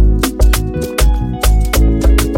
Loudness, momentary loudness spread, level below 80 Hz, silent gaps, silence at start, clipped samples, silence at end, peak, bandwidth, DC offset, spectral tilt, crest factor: -14 LUFS; 3 LU; -12 dBFS; none; 0 s; under 0.1%; 0 s; 0 dBFS; 17 kHz; under 0.1%; -5 dB/octave; 10 dB